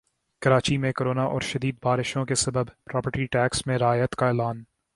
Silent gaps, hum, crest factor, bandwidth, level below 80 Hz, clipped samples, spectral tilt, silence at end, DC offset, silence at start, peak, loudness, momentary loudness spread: none; none; 20 dB; 11.5 kHz; -52 dBFS; under 0.1%; -5 dB/octave; 0.3 s; under 0.1%; 0.4 s; -4 dBFS; -25 LUFS; 7 LU